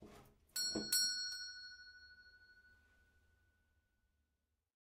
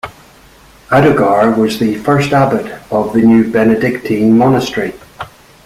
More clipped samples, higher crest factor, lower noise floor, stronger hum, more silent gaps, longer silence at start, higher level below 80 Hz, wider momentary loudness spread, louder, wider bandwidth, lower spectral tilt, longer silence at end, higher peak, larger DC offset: neither; first, 24 dB vs 12 dB; first, -87 dBFS vs -42 dBFS; neither; neither; about the same, 0 s vs 0.05 s; second, -76 dBFS vs -44 dBFS; first, 24 LU vs 15 LU; second, -38 LUFS vs -12 LUFS; about the same, 15.5 kHz vs 15 kHz; second, 0 dB/octave vs -7 dB/octave; first, 2.15 s vs 0.4 s; second, -22 dBFS vs 0 dBFS; neither